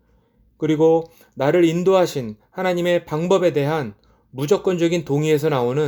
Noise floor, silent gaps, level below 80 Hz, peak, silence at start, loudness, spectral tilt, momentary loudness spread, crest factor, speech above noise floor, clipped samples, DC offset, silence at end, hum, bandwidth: -58 dBFS; none; -58 dBFS; -4 dBFS; 0.6 s; -19 LUFS; -6.5 dB/octave; 12 LU; 16 dB; 40 dB; under 0.1%; under 0.1%; 0 s; none; 20 kHz